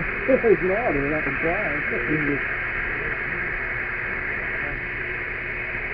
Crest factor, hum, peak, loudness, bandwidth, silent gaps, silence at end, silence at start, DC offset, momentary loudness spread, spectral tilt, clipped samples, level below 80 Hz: 18 dB; none; -6 dBFS; -24 LUFS; 5.2 kHz; none; 0 s; 0 s; under 0.1%; 7 LU; -10.5 dB/octave; under 0.1%; -40 dBFS